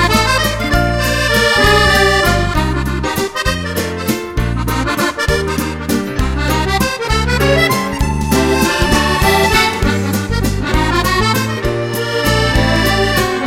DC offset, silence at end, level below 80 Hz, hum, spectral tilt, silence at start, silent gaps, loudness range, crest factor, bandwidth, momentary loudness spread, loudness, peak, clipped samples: under 0.1%; 0 s; -22 dBFS; none; -4.5 dB/octave; 0 s; none; 4 LU; 14 dB; 17 kHz; 8 LU; -14 LUFS; 0 dBFS; under 0.1%